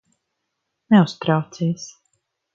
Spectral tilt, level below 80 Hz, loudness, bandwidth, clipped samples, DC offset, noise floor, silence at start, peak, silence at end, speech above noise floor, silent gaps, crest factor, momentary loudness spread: -7 dB/octave; -66 dBFS; -19 LUFS; 7.6 kHz; under 0.1%; under 0.1%; -77 dBFS; 0.9 s; -4 dBFS; 0.65 s; 59 dB; none; 18 dB; 14 LU